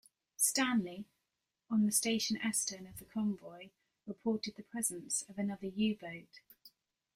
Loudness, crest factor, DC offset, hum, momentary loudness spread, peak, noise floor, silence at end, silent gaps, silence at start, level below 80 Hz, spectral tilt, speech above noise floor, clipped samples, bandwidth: -35 LUFS; 22 dB; under 0.1%; none; 20 LU; -16 dBFS; -87 dBFS; 0.45 s; none; 0.4 s; -74 dBFS; -3 dB/octave; 51 dB; under 0.1%; 16 kHz